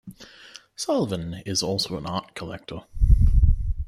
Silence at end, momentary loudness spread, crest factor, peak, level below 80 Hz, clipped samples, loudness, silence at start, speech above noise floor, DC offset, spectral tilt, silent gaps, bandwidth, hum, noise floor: 0 s; 22 LU; 18 dB; -6 dBFS; -24 dBFS; under 0.1%; -25 LUFS; 0.05 s; 20 dB; under 0.1%; -5.5 dB/octave; none; 14 kHz; none; -48 dBFS